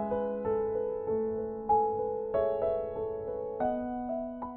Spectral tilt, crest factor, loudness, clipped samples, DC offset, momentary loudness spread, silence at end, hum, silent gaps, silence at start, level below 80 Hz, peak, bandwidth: -7.5 dB/octave; 16 dB; -32 LUFS; under 0.1%; under 0.1%; 7 LU; 0 s; none; none; 0 s; -56 dBFS; -16 dBFS; 4 kHz